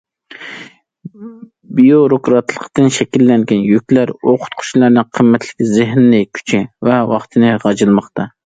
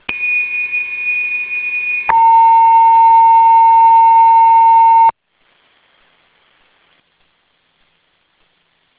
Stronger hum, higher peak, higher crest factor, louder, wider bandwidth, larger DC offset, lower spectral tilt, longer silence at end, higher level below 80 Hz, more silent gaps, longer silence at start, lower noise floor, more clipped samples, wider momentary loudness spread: neither; about the same, 0 dBFS vs 0 dBFS; about the same, 12 dB vs 12 dB; second, -12 LUFS vs -9 LUFS; first, 9.2 kHz vs 4 kHz; neither; first, -6.5 dB/octave vs -5 dB/octave; second, 0.2 s vs 3.9 s; about the same, -54 dBFS vs -54 dBFS; neither; first, 0.4 s vs 0.1 s; second, -37 dBFS vs -60 dBFS; neither; first, 12 LU vs 9 LU